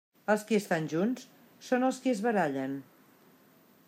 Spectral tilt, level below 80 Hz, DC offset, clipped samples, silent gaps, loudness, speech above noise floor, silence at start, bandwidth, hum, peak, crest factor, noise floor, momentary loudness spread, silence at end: -5.5 dB/octave; -84 dBFS; under 0.1%; under 0.1%; none; -30 LUFS; 32 dB; 0.3 s; 16 kHz; none; -12 dBFS; 18 dB; -61 dBFS; 11 LU; 1.05 s